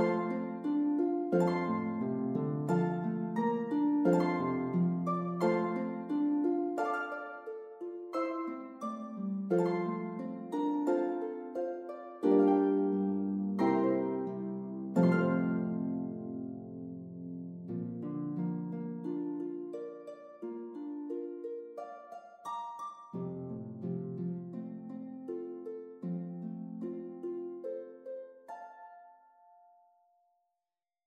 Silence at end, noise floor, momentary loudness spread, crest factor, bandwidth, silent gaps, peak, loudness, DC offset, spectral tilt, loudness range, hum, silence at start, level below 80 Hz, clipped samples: 1.95 s; under -90 dBFS; 15 LU; 20 dB; 8.6 kHz; none; -16 dBFS; -34 LUFS; under 0.1%; -9 dB/octave; 12 LU; none; 0 s; -82 dBFS; under 0.1%